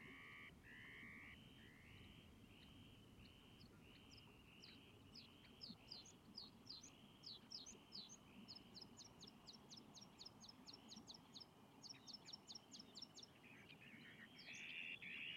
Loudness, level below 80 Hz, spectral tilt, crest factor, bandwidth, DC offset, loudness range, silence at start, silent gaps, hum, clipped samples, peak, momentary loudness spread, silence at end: -59 LUFS; -80 dBFS; -2.5 dB/octave; 20 dB; 15.5 kHz; under 0.1%; 6 LU; 0 s; none; none; under 0.1%; -42 dBFS; 10 LU; 0 s